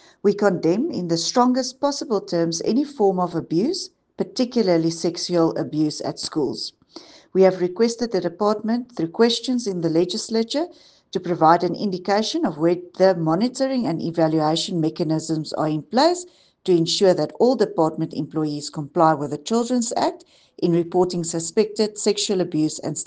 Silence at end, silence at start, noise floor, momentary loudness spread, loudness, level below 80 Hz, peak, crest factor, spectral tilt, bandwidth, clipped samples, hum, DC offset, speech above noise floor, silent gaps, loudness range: 0 s; 0.25 s; -45 dBFS; 8 LU; -21 LUFS; -66 dBFS; -2 dBFS; 20 dB; -5 dB/octave; 9.8 kHz; under 0.1%; none; under 0.1%; 24 dB; none; 2 LU